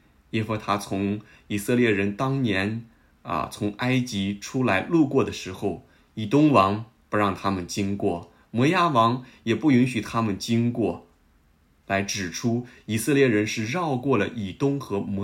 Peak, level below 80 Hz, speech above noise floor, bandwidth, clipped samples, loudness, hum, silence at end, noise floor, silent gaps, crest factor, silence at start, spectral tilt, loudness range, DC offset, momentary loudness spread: -4 dBFS; -58 dBFS; 37 dB; 16 kHz; under 0.1%; -24 LUFS; none; 0 s; -61 dBFS; none; 20 dB; 0.35 s; -6 dB/octave; 3 LU; under 0.1%; 11 LU